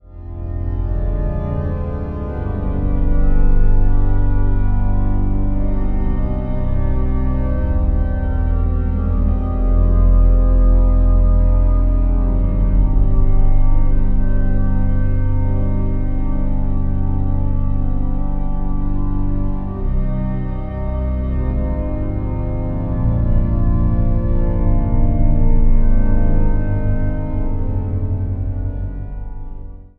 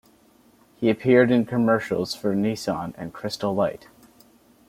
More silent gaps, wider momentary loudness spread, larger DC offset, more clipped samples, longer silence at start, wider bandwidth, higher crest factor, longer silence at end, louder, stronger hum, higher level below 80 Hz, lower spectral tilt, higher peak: neither; second, 8 LU vs 13 LU; neither; neither; second, 0.1 s vs 0.8 s; second, 2.4 kHz vs 16 kHz; second, 12 dB vs 20 dB; second, 0.15 s vs 0.9 s; first, -20 LUFS vs -23 LUFS; neither; first, -16 dBFS vs -60 dBFS; first, -12.5 dB/octave vs -6.5 dB/octave; about the same, -2 dBFS vs -4 dBFS